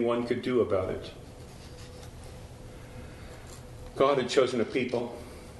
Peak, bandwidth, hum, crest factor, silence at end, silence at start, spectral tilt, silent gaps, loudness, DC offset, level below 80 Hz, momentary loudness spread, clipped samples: -10 dBFS; 12 kHz; none; 22 dB; 0 s; 0 s; -5.5 dB/octave; none; -28 LUFS; under 0.1%; -52 dBFS; 20 LU; under 0.1%